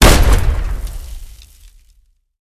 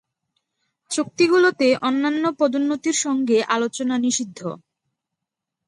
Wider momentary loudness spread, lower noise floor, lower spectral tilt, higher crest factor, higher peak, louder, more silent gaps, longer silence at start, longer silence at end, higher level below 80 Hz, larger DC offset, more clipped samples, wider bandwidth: first, 23 LU vs 12 LU; second, -53 dBFS vs -83 dBFS; about the same, -4 dB/octave vs -3 dB/octave; about the same, 14 dB vs 16 dB; first, 0 dBFS vs -4 dBFS; first, -16 LUFS vs -20 LUFS; neither; second, 0 s vs 0.9 s; about the same, 1.15 s vs 1.1 s; first, -16 dBFS vs -72 dBFS; neither; first, 0.2% vs under 0.1%; first, 15 kHz vs 11.5 kHz